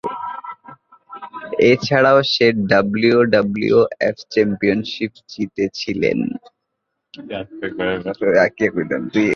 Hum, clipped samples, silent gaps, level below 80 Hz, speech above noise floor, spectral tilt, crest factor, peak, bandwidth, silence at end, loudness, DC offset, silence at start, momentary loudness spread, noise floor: none; under 0.1%; none; -54 dBFS; 59 dB; -6 dB/octave; 18 dB; 0 dBFS; 7 kHz; 0 s; -17 LUFS; under 0.1%; 0.05 s; 16 LU; -76 dBFS